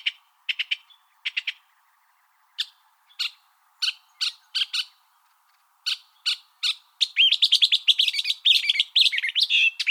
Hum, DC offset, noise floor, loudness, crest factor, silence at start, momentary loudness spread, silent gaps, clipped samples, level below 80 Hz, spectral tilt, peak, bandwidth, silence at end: none; under 0.1%; -64 dBFS; -21 LUFS; 20 dB; 0.05 s; 15 LU; none; under 0.1%; under -90 dBFS; 12.5 dB/octave; -6 dBFS; 19.5 kHz; 0 s